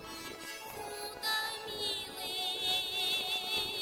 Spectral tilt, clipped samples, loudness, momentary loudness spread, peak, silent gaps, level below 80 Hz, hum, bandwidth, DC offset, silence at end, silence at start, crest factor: -0.5 dB/octave; under 0.1%; -34 LUFS; 12 LU; -22 dBFS; none; -66 dBFS; none; 17.5 kHz; under 0.1%; 0 s; 0 s; 16 dB